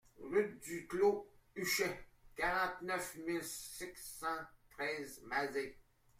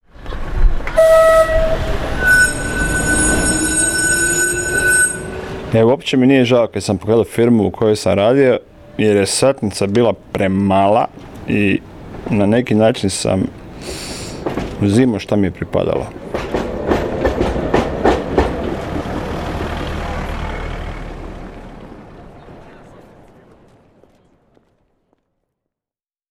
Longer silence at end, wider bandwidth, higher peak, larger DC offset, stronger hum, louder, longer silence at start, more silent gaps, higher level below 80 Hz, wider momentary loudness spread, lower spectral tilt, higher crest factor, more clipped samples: second, 0.4 s vs 3.6 s; about the same, 16 kHz vs 16.5 kHz; second, -20 dBFS vs -2 dBFS; neither; neither; second, -39 LUFS vs -15 LUFS; about the same, 0.2 s vs 0.2 s; neither; second, -66 dBFS vs -28 dBFS; second, 12 LU vs 15 LU; second, -3 dB/octave vs -4.5 dB/octave; about the same, 20 dB vs 16 dB; neither